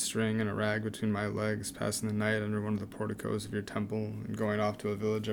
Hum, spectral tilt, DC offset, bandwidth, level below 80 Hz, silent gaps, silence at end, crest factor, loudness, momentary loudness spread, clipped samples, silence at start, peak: none; -5 dB/octave; under 0.1%; 19 kHz; -62 dBFS; none; 0 s; 16 dB; -33 LUFS; 5 LU; under 0.1%; 0 s; -16 dBFS